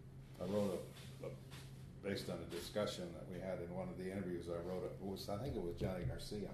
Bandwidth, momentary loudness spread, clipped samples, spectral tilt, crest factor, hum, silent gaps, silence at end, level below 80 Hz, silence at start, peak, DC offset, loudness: 13.5 kHz; 9 LU; under 0.1%; -6 dB/octave; 18 dB; none; none; 0 s; -60 dBFS; 0 s; -28 dBFS; under 0.1%; -45 LUFS